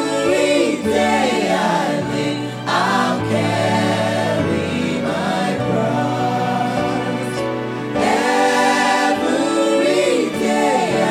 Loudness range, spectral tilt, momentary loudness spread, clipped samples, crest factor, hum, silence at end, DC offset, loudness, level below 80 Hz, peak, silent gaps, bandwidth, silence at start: 3 LU; -5 dB/octave; 6 LU; under 0.1%; 14 dB; none; 0 s; under 0.1%; -18 LUFS; -52 dBFS; -4 dBFS; none; 16 kHz; 0 s